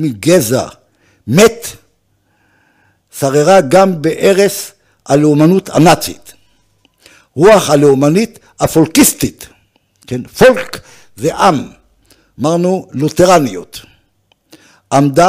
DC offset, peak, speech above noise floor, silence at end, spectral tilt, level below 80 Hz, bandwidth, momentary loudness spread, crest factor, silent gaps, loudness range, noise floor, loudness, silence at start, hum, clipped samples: under 0.1%; 0 dBFS; 48 dB; 0 s; -5 dB/octave; -42 dBFS; 16 kHz; 18 LU; 12 dB; none; 4 LU; -58 dBFS; -11 LUFS; 0 s; none; under 0.1%